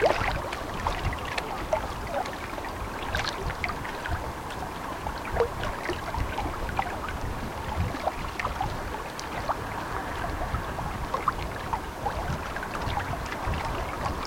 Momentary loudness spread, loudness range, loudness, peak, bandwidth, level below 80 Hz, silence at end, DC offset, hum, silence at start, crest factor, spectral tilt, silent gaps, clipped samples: 5 LU; 1 LU; -31 LUFS; -8 dBFS; 17 kHz; -38 dBFS; 0 s; under 0.1%; none; 0 s; 22 dB; -5 dB/octave; none; under 0.1%